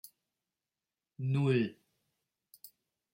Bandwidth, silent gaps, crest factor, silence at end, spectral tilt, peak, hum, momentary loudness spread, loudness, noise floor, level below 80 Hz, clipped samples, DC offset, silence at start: 16.5 kHz; none; 20 dB; 0.45 s; -8 dB/octave; -18 dBFS; none; 25 LU; -33 LUFS; under -90 dBFS; -78 dBFS; under 0.1%; under 0.1%; 1.2 s